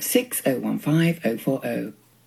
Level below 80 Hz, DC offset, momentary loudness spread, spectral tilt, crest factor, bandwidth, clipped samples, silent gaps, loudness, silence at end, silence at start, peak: -70 dBFS; under 0.1%; 8 LU; -5 dB/octave; 18 dB; 16 kHz; under 0.1%; none; -24 LUFS; 0.35 s; 0 s; -4 dBFS